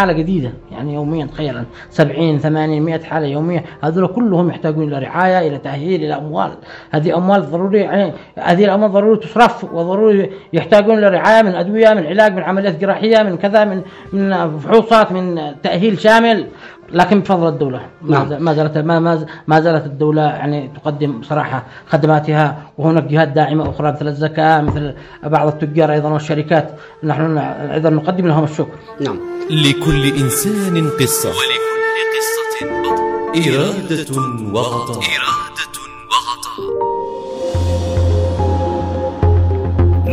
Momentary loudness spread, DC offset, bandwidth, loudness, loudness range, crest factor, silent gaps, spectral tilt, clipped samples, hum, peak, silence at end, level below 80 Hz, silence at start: 10 LU; under 0.1%; 15.5 kHz; -15 LUFS; 5 LU; 14 dB; none; -6 dB/octave; under 0.1%; none; 0 dBFS; 0 s; -34 dBFS; 0 s